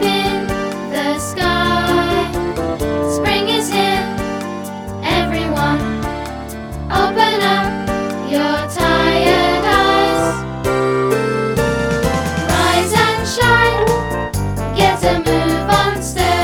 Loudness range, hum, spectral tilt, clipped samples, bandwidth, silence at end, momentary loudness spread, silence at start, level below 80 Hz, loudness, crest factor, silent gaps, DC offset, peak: 3 LU; none; -4.5 dB/octave; under 0.1%; over 20 kHz; 0 s; 8 LU; 0 s; -30 dBFS; -16 LUFS; 16 dB; none; under 0.1%; 0 dBFS